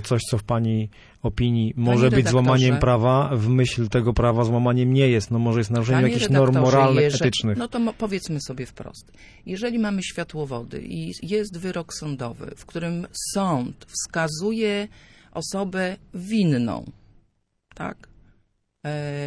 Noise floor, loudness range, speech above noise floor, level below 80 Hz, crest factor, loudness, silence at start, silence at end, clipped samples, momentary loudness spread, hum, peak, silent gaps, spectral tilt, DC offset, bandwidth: -68 dBFS; 10 LU; 46 dB; -42 dBFS; 18 dB; -22 LUFS; 0 s; 0 s; under 0.1%; 16 LU; none; -4 dBFS; none; -6 dB/octave; under 0.1%; 11 kHz